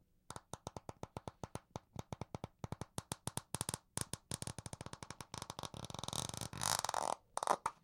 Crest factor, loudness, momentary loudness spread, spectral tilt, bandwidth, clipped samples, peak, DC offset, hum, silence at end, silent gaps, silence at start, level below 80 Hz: 30 dB; -44 LUFS; 14 LU; -3 dB/octave; 17 kHz; under 0.1%; -16 dBFS; under 0.1%; none; 0.1 s; none; 0.3 s; -64 dBFS